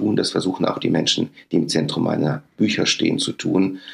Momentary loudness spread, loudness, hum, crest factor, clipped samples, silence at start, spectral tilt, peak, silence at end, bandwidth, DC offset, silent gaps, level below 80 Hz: 4 LU; -20 LUFS; none; 16 dB; under 0.1%; 0 s; -4.5 dB/octave; -4 dBFS; 0 s; 12 kHz; under 0.1%; none; -64 dBFS